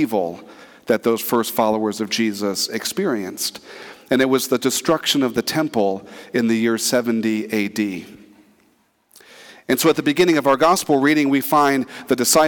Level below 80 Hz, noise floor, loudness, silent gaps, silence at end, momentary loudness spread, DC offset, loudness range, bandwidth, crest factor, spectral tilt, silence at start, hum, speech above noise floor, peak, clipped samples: -62 dBFS; -61 dBFS; -19 LUFS; none; 0 s; 10 LU; under 0.1%; 5 LU; 19 kHz; 14 dB; -3.5 dB/octave; 0 s; none; 42 dB; -4 dBFS; under 0.1%